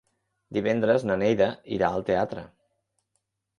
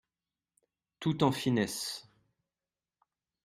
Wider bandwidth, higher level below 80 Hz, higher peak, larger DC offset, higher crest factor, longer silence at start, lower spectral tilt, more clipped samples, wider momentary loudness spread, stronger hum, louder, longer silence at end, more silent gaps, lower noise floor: second, 10.5 kHz vs 16 kHz; first, -58 dBFS vs -70 dBFS; first, -8 dBFS vs -12 dBFS; neither; second, 18 dB vs 24 dB; second, 0.5 s vs 1 s; first, -7 dB/octave vs -5 dB/octave; neither; about the same, 9 LU vs 10 LU; neither; first, -25 LUFS vs -32 LUFS; second, 1.15 s vs 1.45 s; neither; second, -78 dBFS vs under -90 dBFS